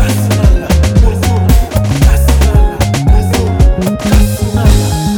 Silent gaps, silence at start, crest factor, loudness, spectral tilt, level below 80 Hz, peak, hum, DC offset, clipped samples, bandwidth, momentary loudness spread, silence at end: none; 0 s; 8 dB; -10 LUFS; -6 dB/octave; -10 dBFS; 0 dBFS; none; under 0.1%; under 0.1%; 19.5 kHz; 3 LU; 0 s